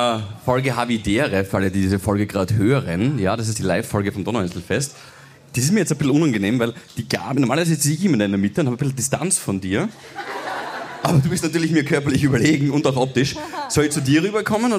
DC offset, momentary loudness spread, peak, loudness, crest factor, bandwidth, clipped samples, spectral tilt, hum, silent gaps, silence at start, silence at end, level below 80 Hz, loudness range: under 0.1%; 7 LU; -4 dBFS; -20 LUFS; 16 dB; 15.5 kHz; under 0.1%; -5 dB/octave; none; none; 0 s; 0 s; -48 dBFS; 3 LU